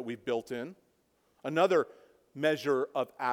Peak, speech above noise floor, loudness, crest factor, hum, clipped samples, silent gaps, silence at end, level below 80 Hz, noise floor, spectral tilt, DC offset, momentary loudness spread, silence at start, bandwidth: -12 dBFS; 41 dB; -31 LUFS; 20 dB; none; under 0.1%; none; 0 s; -80 dBFS; -72 dBFS; -5.5 dB/octave; under 0.1%; 15 LU; 0 s; 17 kHz